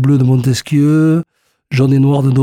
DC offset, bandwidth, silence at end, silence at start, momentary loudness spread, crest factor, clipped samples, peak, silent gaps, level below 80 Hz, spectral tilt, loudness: under 0.1%; 14.5 kHz; 0 s; 0 s; 7 LU; 10 dB; under 0.1%; -2 dBFS; none; -48 dBFS; -7.5 dB/octave; -12 LUFS